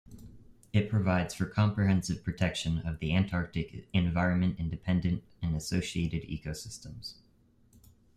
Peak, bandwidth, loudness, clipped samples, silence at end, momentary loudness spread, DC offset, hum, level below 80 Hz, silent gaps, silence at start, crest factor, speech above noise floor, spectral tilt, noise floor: -14 dBFS; 13.5 kHz; -31 LUFS; under 0.1%; 1.05 s; 11 LU; under 0.1%; none; -50 dBFS; none; 0.1 s; 18 dB; 34 dB; -6 dB/octave; -64 dBFS